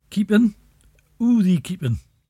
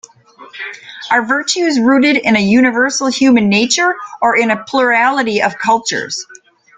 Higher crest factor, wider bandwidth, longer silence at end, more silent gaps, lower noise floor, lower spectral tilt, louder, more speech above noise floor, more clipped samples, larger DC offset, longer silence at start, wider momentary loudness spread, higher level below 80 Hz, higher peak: about the same, 16 dB vs 14 dB; first, 13.5 kHz vs 9.4 kHz; second, 0.3 s vs 0.45 s; neither; first, -57 dBFS vs -40 dBFS; first, -7.5 dB/octave vs -3.5 dB/octave; second, -20 LUFS vs -12 LUFS; first, 38 dB vs 27 dB; neither; neither; second, 0.1 s vs 0.4 s; second, 8 LU vs 13 LU; first, -50 dBFS vs -56 dBFS; second, -4 dBFS vs 0 dBFS